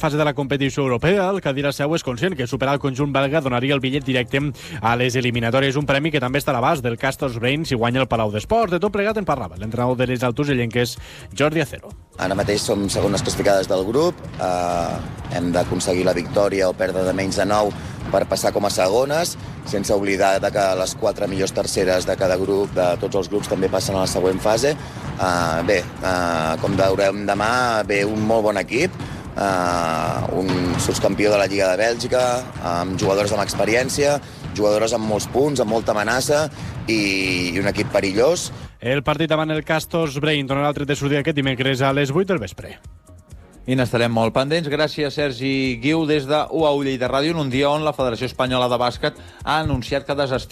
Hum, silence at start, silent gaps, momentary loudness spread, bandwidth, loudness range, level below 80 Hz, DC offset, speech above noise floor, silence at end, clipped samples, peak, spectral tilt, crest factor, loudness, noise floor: none; 0 s; none; 6 LU; 15.5 kHz; 2 LU; -42 dBFS; under 0.1%; 23 dB; 0 s; under 0.1%; -6 dBFS; -5 dB/octave; 14 dB; -20 LUFS; -43 dBFS